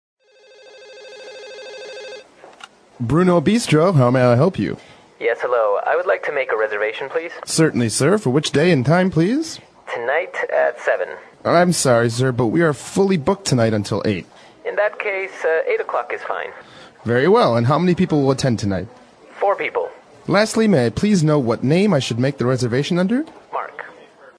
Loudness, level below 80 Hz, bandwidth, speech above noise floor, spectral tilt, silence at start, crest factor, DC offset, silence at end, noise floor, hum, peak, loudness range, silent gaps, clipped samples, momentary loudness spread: -18 LUFS; -52 dBFS; 11 kHz; 31 dB; -5.5 dB/octave; 0.8 s; 16 dB; under 0.1%; 0.45 s; -48 dBFS; none; -2 dBFS; 3 LU; none; under 0.1%; 16 LU